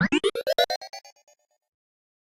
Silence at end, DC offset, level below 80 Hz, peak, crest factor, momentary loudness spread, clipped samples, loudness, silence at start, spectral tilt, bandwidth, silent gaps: 1.3 s; under 0.1%; -62 dBFS; -8 dBFS; 20 dB; 18 LU; under 0.1%; -25 LUFS; 0 s; -4.5 dB/octave; 16.5 kHz; 0.76-0.81 s